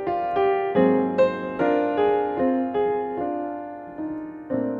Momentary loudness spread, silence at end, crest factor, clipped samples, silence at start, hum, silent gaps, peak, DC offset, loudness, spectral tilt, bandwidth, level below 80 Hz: 12 LU; 0 s; 16 dB; under 0.1%; 0 s; none; none; -8 dBFS; under 0.1%; -23 LUFS; -8.5 dB/octave; 4.9 kHz; -58 dBFS